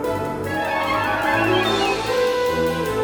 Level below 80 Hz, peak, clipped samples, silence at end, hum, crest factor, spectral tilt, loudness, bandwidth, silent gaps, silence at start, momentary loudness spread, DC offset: -44 dBFS; -6 dBFS; under 0.1%; 0 s; none; 14 dB; -4.5 dB/octave; -20 LUFS; over 20 kHz; none; 0 s; 6 LU; under 0.1%